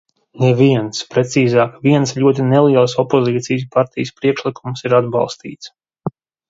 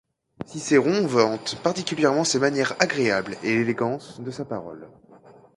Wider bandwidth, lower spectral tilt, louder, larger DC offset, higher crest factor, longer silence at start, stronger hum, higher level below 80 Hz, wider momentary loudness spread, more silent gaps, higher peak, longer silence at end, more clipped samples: second, 7.8 kHz vs 11.5 kHz; first, -6.5 dB/octave vs -4 dB/octave; first, -15 LUFS vs -23 LUFS; neither; second, 16 dB vs 22 dB; about the same, 0.35 s vs 0.4 s; neither; first, -56 dBFS vs -64 dBFS; about the same, 16 LU vs 14 LU; neither; about the same, 0 dBFS vs -2 dBFS; first, 0.4 s vs 0.25 s; neither